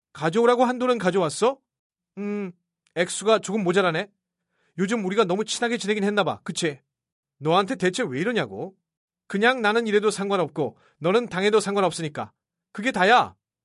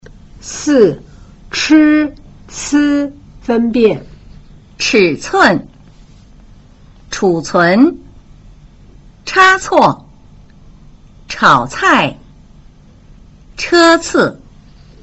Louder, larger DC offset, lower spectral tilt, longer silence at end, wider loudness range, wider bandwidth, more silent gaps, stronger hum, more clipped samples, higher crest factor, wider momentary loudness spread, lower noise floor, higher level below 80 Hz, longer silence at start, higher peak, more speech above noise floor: second, -23 LUFS vs -12 LUFS; neither; about the same, -4.5 dB/octave vs -4 dB/octave; second, 0.35 s vs 0.7 s; about the same, 3 LU vs 3 LU; first, 11.5 kHz vs 8.2 kHz; first, 1.79-1.90 s, 7.12-7.23 s, 8.97-9.08 s vs none; neither; neither; first, 20 dB vs 14 dB; second, 13 LU vs 19 LU; first, -74 dBFS vs -41 dBFS; second, -68 dBFS vs -42 dBFS; second, 0.15 s vs 0.45 s; second, -4 dBFS vs 0 dBFS; first, 51 dB vs 30 dB